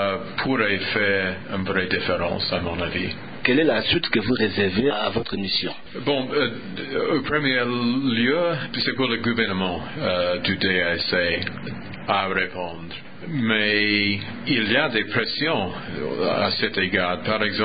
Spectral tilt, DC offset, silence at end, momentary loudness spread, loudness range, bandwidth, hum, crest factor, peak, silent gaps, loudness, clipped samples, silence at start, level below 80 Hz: -10 dB/octave; 0.8%; 0 s; 9 LU; 2 LU; 5 kHz; none; 20 dB; -4 dBFS; none; -22 LUFS; under 0.1%; 0 s; -48 dBFS